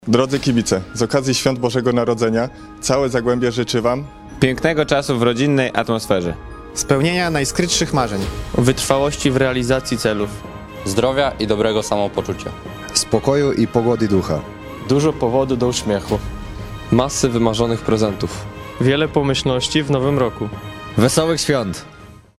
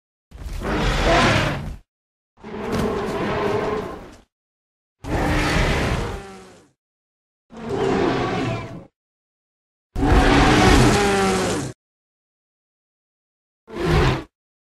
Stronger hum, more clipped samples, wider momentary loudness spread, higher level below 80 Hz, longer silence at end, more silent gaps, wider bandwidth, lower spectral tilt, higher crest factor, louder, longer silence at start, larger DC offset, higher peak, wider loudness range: neither; neither; second, 10 LU vs 21 LU; second, -38 dBFS vs -30 dBFS; about the same, 0.25 s vs 0.35 s; second, none vs 1.88-2.37 s, 4.32-4.96 s, 6.78-7.50 s, 8.96-9.90 s, 11.75-13.67 s; about the same, 15.5 kHz vs 15 kHz; about the same, -5 dB/octave vs -5 dB/octave; about the same, 18 dB vs 18 dB; about the same, -18 LUFS vs -20 LUFS; second, 0 s vs 0.35 s; neither; about the same, 0 dBFS vs -2 dBFS; second, 2 LU vs 8 LU